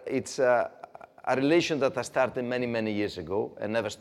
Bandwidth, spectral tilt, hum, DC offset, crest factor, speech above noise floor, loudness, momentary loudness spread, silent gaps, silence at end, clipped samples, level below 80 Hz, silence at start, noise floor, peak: 13 kHz; -5 dB/octave; none; under 0.1%; 18 dB; 20 dB; -28 LUFS; 10 LU; none; 0.05 s; under 0.1%; -68 dBFS; 0 s; -48 dBFS; -10 dBFS